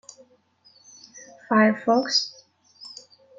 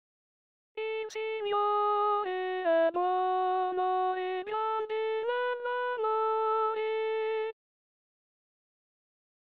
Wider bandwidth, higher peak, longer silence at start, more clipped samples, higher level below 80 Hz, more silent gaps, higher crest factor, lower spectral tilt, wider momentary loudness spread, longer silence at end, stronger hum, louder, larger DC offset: first, 7.8 kHz vs 6.8 kHz; first, -6 dBFS vs -18 dBFS; first, 1.15 s vs 0.75 s; neither; first, -76 dBFS vs -84 dBFS; neither; first, 20 dB vs 14 dB; first, -4 dB/octave vs 0.5 dB/octave; first, 25 LU vs 8 LU; second, 0.5 s vs 1.95 s; neither; first, -21 LUFS vs -30 LUFS; neither